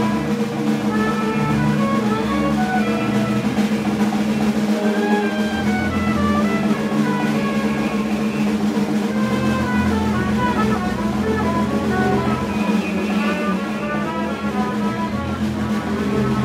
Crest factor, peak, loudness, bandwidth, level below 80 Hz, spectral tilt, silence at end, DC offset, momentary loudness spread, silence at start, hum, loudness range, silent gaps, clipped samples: 14 dB; -4 dBFS; -20 LUFS; 15 kHz; -40 dBFS; -6.5 dB/octave; 0 s; under 0.1%; 3 LU; 0 s; none; 2 LU; none; under 0.1%